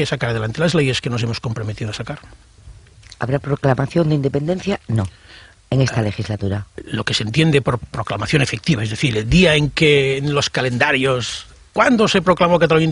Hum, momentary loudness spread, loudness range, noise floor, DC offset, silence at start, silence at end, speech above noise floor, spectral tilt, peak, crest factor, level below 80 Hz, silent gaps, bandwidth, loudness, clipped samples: none; 12 LU; 6 LU; -42 dBFS; under 0.1%; 0 s; 0 s; 25 dB; -5.5 dB/octave; 0 dBFS; 18 dB; -38 dBFS; none; 11 kHz; -18 LUFS; under 0.1%